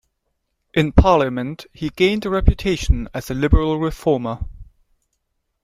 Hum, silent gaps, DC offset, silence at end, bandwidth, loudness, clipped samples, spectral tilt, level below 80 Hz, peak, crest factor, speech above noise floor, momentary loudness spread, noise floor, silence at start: none; none; under 0.1%; 1 s; 14.5 kHz; -19 LUFS; under 0.1%; -6.5 dB/octave; -24 dBFS; 0 dBFS; 18 dB; 55 dB; 13 LU; -73 dBFS; 0.75 s